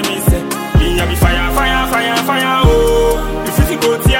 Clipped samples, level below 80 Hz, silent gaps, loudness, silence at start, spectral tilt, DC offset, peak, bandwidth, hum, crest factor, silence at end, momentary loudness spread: under 0.1%; -18 dBFS; none; -13 LUFS; 0 s; -5 dB/octave; under 0.1%; 0 dBFS; 17 kHz; none; 12 dB; 0 s; 4 LU